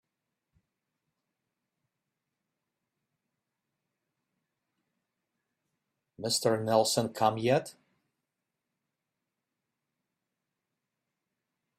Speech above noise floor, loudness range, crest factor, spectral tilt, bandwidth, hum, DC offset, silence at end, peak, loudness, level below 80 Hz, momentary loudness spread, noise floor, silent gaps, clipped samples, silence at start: 59 dB; 7 LU; 26 dB; -4 dB/octave; 15 kHz; none; under 0.1%; 4.05 s; -10 dBFS; -28 LUFS; -76 dBFS; 7 LU; -87 dBFS; none; under 0.1%; 6.2 s